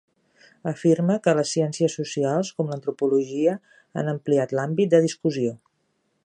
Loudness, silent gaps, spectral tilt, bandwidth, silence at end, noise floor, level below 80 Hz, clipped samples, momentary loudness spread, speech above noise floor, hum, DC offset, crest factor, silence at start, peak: -23 LUFS; none; -6 dB/octave; 11 kHz; 0.7 s; -71 dBFS; -74 dBFS; under 0.1%; 9 LU; 49 dB; none; under 0.1%; 18 dB; 0.65 s; -6 dBFS